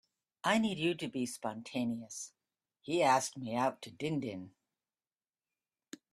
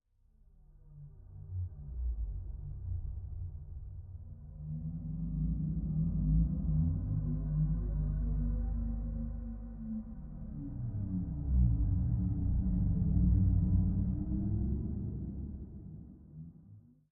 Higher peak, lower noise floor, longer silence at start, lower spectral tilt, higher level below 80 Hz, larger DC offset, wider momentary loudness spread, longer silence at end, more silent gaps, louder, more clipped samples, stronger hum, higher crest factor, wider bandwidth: first, -14 dBFS vs -18 dBFS; first, under -90 dBFS vs -65 dBFS; second, 0.45 s vs 0.7 s; second, -4 dB/octave vs -14.5 dB/octave; second, -76 dBFS vs -38 dBFS; neither; about the same, 19 LU vs 18 LU; first, 1.65 s vs 0.3 s; neither; about the same, -35 LUFS vs -35 LUFS; neither; second, none vs 50 Hz at -45 dBFS; first, 22 dB vs 16 dB; first, 14 kHz vs 1.6 kHz